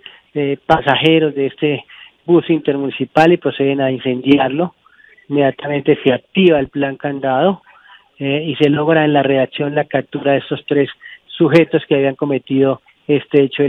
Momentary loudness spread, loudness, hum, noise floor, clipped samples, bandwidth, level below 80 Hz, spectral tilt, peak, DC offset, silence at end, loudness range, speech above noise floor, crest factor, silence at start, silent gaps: 9 LU; -15 LUFS; none; -45 dBFS; under 0.1%; 7.2 kHz; -52 dBFS; -8 dB/octave; 0 dBFS; under 0.1%; 0 s; 1 LU; 31 dB; 16 dB; 0.35 s; none